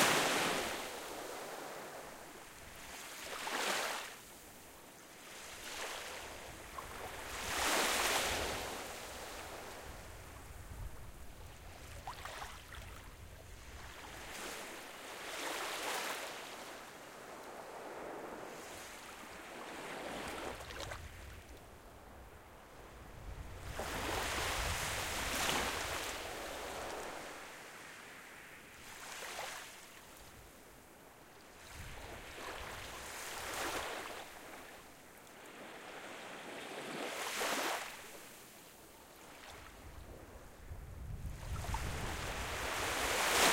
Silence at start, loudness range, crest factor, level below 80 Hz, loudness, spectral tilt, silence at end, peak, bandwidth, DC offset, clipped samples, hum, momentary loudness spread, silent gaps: 0 s; 13 LU; 26 dB; -56 dBFS; -41 LUFS; -2 dB/octave; 0 s; -16 dBFS; 16.5 kHz; under 0.1%; under 0.1%; none; 19 LU; none